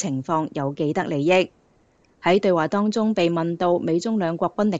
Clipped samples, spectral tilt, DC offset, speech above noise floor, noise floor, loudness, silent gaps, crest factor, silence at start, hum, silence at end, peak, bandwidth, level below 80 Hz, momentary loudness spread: under 0.1%; -6.5 dB/octave; 0.1%; 39 dB; -60 dBFS; -22 LUFS; none; 16 dB; 0 s; none; 0 s; -6 dBFS; 8 kHz; -64 dBFS; 6 LU